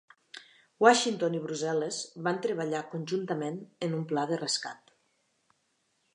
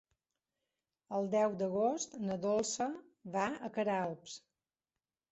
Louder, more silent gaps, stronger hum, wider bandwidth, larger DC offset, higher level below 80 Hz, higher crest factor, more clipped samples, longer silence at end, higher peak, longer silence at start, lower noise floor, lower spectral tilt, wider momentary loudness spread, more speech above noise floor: first, -30 LUFS vs -36 LUFS; neither; neither; first, 11 kHz vs 8 kHz; neither; second, -86 dBFS vs -78 dBFS; first, 26 dB vs 18 dB; neither; first, 1.4 s vs 0.95 s; first, -6 dBFS vs -20 dBFS; second, 0.35 s vs 1.1 s; second, -75 dBFS vs under -90 dBFS; about the same, -4 dB/octave vs -5 dB/octave; first, 21 LU vs 12 LU; second, 45 dB vs over 55 dB